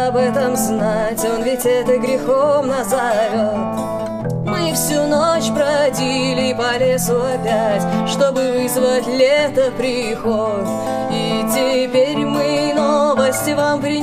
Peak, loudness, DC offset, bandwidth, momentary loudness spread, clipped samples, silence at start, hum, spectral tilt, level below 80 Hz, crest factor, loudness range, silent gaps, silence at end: -4 dBFS; -17 LUFS; under 0.1%; 15.5 kHz; 5 LU; under 0.1%; 0 s; none; -4.5 dB/octave; -44 dBFS; 14 dB; 1 LU; none; 0 s